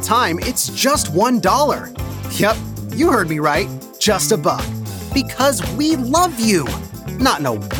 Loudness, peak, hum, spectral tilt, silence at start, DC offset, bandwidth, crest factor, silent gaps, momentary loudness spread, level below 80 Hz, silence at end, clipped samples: -17 LUFS; -2 dBFS; none; -4 dB/octave; 0 s; under 0.1%; over 20 kHz; 16 dB; none; 10 LU; -36 dBFS; 0 s; under 0.1%